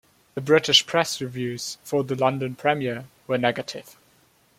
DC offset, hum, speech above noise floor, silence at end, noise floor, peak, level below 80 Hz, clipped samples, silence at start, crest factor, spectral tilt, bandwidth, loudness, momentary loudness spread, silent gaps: under 0.1%; none; 37 dB; 0.7 s; -60 dBFS; -2 dBFS; -66 dBFS; under 0.1%; 0.35 s; 22 dB; -3.5 dB/octave; 16.5 kHz; -23 LUFS; 17 LU; none